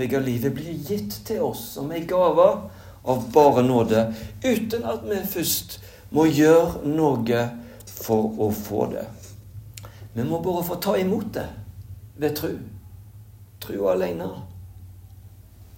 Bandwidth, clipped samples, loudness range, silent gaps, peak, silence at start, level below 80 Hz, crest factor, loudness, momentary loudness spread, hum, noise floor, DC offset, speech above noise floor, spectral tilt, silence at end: 16.5 kHz; under 0.1%; 8 LU; none; -2 dBFS; 0 s; -50 dBFS; 22 dB; -23 LUFS; 24 LU; none; -46 dBFS; under 0.1%; 24 dB; -6 dB/octave; 0.15 s